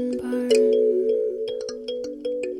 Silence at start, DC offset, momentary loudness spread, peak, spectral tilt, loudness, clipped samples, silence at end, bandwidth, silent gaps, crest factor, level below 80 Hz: 0 s; under 0.1%; 12 LU; -8 dBFS; -4 dB/octave; -23 LUFS; under 0.1%; 0 s; 12.5 kHz; none; 16 dB; -62 dBFS